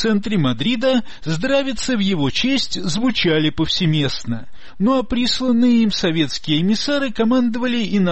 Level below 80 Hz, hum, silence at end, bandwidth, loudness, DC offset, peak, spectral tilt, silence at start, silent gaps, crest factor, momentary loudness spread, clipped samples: -42 dBFS; none; 0 s; 8.6 kHz; -18 LUFS; 4%; -6 dBFS; -5 dB/octave; 0 s; none; 12 dB; 5 LU; under 0.1%